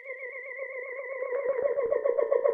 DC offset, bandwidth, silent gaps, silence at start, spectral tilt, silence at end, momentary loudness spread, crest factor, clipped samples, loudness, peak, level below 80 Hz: under 0.1%; 3.4 kHz; none; 0 s; -7.5 dB/octave; 0 s; 11 LU; 18 dB; under 0.1%; -30 LUFS; -12 dBFS; -72 dBFS